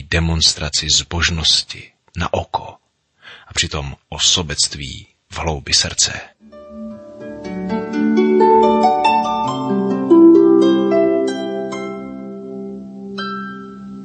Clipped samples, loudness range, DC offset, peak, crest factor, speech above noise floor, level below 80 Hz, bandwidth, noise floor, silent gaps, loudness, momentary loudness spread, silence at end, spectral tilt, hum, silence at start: under 0.1%; 7 LU; under 0.1%; -2 dBFS; 16 dB; 26 dB; -36 dBFS; 8.8 kHz; -45 dBFS; none; -15 LUFS; 20 LU; 0 s; -3.5 dB/octave; none; 0 s